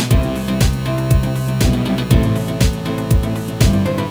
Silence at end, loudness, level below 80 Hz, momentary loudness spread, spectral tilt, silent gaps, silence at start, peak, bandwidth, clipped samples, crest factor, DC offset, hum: 0 s; -17 LUFS; -22 dBFS; 4 LU; -6 dB/octave; none; 0 s; 0 dBFS; over 20 kHz; under 0.1%; 16 dB; under 0.1%; none